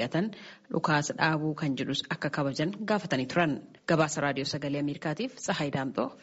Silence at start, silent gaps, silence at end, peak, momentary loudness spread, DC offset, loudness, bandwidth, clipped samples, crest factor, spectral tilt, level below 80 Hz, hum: 0 s; none; 0.05 s; -10 dBFS; 6 LU; under 0.1%; -30 LUFS; 8 kHz; under 0.1%; 20 dB; -4.5 dB/octave; -66 dBFS; none